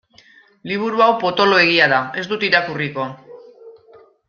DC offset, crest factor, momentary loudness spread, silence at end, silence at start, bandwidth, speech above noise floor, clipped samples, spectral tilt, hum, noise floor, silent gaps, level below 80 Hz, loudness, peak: under 0.1%; 18 dB; 14 LU; 0.6 s; 0.65 s; 7 kHz; 33 dB; under 0.1%; -5 dB/octave; none; -50 dBFS; none; -62 dBFS; -16 LUFS; -2 dBFS